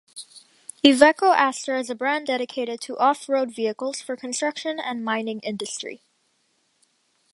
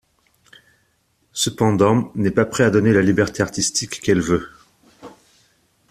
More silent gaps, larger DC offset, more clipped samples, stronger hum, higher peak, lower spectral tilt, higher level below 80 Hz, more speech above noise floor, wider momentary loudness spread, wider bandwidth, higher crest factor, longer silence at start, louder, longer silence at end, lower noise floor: neither; neither; neither; neither; about the same, 0 dBFS vs -2 dBFS; second, -2.5 dB/octave vs -5 dB/octave; second, -68 dBFS vs -50 dBFS; about the same, 46 dB vs 47 dB; first, 16 LU vs 7 LU; second, 11.5 kHz vs 14.5 kHz; first, 24 dB vs 18 dB; second, 0.15 s vs 1.35 s; second, -22 LUFS vs -18 LUFS; first, 1.35 s vs 0.8 s; first, -68 dBFS vs -64 dBFS